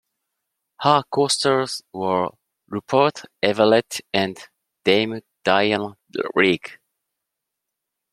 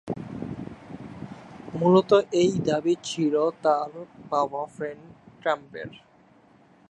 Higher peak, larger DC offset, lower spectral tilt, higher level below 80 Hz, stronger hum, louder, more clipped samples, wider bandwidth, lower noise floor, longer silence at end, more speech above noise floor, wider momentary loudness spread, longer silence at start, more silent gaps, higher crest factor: first, -2 dBFS vs -6 dBFS; neither; second, -4 dB/octave vs -6 dB/octave; about the same, -64 dBFS vs -62 dBFS; neither; first, -21 LUFS vs -25 LUFS; neither; first, 14.5 kHz vs 9.2 kHz; first, -82 dBFS vs -57 dBFS; first, 1.4 s vs 0.95 s; first, 62 dB vs 33 dB; second, 11 LU vs 21 LU; first, 0.8 s vs 0.05 s; neither; about the same, 22 dB vs 20 dB